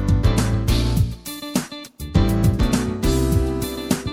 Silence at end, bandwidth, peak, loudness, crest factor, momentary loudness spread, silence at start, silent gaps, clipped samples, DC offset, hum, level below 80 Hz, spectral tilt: 0 s; 17 kHz; -4 dBFS; -21 LUFS; 16 dB; 7 LU; 0 s; none; under 0.1%; under 0.1%; none; -26 dBFS; -6 dB/octave